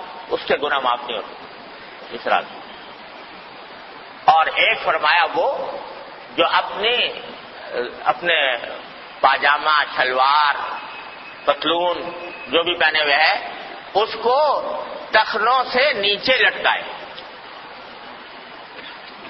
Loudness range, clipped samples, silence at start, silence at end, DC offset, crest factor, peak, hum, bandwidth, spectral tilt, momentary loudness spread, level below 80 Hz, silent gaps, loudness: 5 LU; under 0.1%; 0 s; 0 s; under 0.1%; 20 dB; 0 dBFS; none; 6 kHz; -5 dB/octave; 21 LU; -60 dBFS; none; -18 LUFS